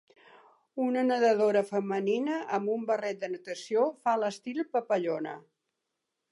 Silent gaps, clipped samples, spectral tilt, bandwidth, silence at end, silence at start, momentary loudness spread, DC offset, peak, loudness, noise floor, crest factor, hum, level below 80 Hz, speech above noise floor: none; under 0.1%; -5.5 dB/octave; 11.5 kHz; 0.9 s; 0.75 s; 11 LU; under 0.1%; -14 dBFS; -29 LUFS; -84 dBFS; 16 dB; none; -88 dBFS; 55 dB